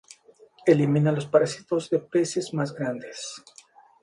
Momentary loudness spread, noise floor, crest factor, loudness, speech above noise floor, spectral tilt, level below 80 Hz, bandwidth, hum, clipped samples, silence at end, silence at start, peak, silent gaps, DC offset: 15 LU; -55 dBFS; 20 dB; -24 LUFS; 31 dB; -6.5 dB/octave; -70 dBFS; 11.5 kHz; none; under 0.1%; 0.65 s; 0.65 s; -6 dBFS; none; under 0.1%